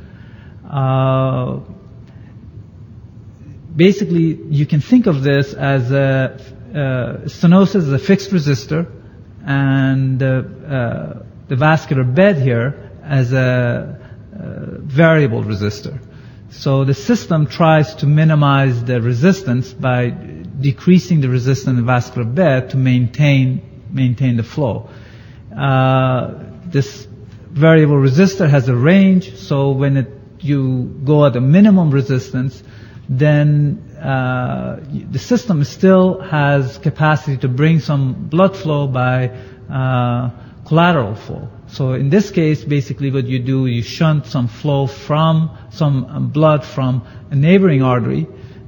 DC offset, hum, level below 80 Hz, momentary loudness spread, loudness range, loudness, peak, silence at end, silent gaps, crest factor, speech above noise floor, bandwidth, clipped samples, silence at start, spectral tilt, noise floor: under 0.1%; none; -46 dBFS; 14 LU; 4 LU; -15 LUFS; 0 dBFS; 0.05 s; none; 14 dB; 23 dB; 17 kHz; under 0.1%; 0 s; -8 dB/octave; -37 dBFS